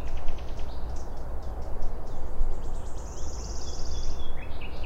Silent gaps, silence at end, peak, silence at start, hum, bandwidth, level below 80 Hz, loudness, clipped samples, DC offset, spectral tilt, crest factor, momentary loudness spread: none; 0 s; -10 dBFS; 0 s; none; 7.4 kHz; -30 dBFS; -38 LUFS; under 0.1%; under 0.1%; -5 dB/octave; 14 dB; 4 LU